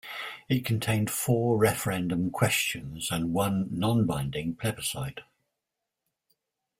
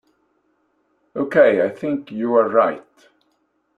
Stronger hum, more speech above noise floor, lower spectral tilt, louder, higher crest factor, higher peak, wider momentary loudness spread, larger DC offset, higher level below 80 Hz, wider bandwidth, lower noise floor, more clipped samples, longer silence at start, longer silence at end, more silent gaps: neither; first, 58 dB vs 49 dB; second, -5 dB/octave vs -7.5 dB/octave; second, -28 LUFS vs -18 LUFS; about the same, 20 dB vs 18 dB; second, -8 dBFS vs -2 dBFS; second, 8 LU vs 13 LU; neither; first, -56 dBFS vs -68 dBFS; first, 16 kHz vs 4.9 kHz; first, -86 dBFS vs -67 dBFS; neither; second, 0.05 s vs 1.15 s; first, 1.55 s vs 1 s; neither